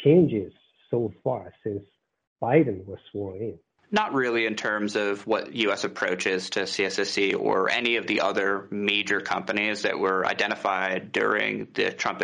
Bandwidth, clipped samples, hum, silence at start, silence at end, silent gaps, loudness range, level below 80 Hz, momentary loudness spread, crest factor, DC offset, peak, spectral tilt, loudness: 10.5 kHz; under 0.1%; none; 0 s; 0 s; 2.27-2.36 s; 4 LU; -66 dBFS; 11 LU; 20 dB; under 0.1%; -6 dBFS; -5 dB/octave; -25 LUFS